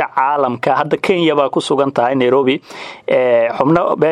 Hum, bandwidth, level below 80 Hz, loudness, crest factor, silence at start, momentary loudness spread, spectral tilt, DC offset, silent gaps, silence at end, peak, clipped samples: none; 11.5 kHz; -56 dBFS; -14 LUFS; 14 dB; 0 s; 4 LU; -6 dB/octave; under 0.1%; none; 0 s; 0 dBFS; under 0.1%